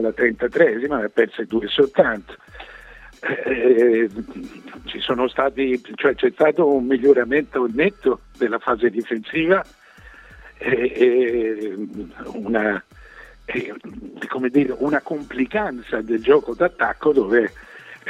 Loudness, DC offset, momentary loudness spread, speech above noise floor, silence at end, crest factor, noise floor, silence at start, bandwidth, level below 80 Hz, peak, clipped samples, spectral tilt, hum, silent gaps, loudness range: -20 LUFS; under 0.1%; 17 LU; 25 dB; 0 s; 20 dB; -45 dBFS; 0 s; 7.6 kHz; -50 dBFS; 0 dBFS; under 0.1%; -6.5 dB/octave; none; none; 5 LU